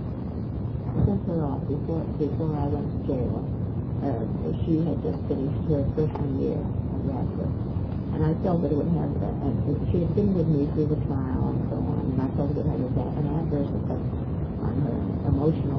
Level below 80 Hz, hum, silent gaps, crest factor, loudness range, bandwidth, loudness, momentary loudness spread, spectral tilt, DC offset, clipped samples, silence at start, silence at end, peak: -38 dBFS; none; none; 16 dB; 2 LU; 5.4 kHz; -27 LUFS; 5 LU; -12 dB/octave; under 0.1%; under 0.1%; 0 s; 0 s; -10 dBFS